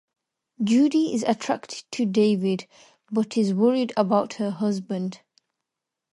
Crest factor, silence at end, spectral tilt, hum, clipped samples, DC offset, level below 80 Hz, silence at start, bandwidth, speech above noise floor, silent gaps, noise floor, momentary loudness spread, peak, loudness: 18 dB; 1 s; -6 dB/octave; none; under 0.1%; under 0.1%; -74 dBFS; 0.6 s; 11.5 kHz; 63 dB; none; -86 dBFS; 9 LU; -6 dBFS; -24 LUFS